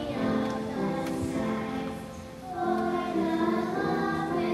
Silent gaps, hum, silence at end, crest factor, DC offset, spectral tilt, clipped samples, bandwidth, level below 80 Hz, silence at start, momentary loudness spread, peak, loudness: none; none; 0 s; 14 dB; under 0.1%; -6.5 dB/octave; under 0.1%; 13.5 kHz; -54 dBFS; 0 s; 9 LU; -16 dBFS; -30 LUFS